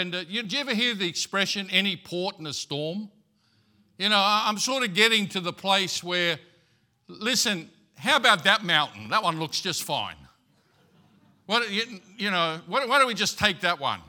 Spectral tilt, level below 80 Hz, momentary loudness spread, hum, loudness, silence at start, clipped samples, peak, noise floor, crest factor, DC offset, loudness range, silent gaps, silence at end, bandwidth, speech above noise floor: -2.5 dB/octave; -66 dBFS; 11 LU; none; -24 LUFS; 0 s; under 0.1%; -2 dBFS; -66 dBFS; 24 dB; under 0.1%; 5 LU; none; 0.05 s; 18 kHz; 40 dB